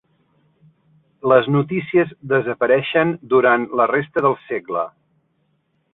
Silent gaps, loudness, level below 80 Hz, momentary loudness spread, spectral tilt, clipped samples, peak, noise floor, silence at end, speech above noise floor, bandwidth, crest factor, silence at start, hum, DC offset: none; -18 LUFS; -62 dBFS; 10 LU; -10 dB/octave; under 0.1%; -2 dBFS; -66 dBFS; 1.05 s; 49 dB; 4 kHz; 18 dB; 1.25 s; none; under 0.1%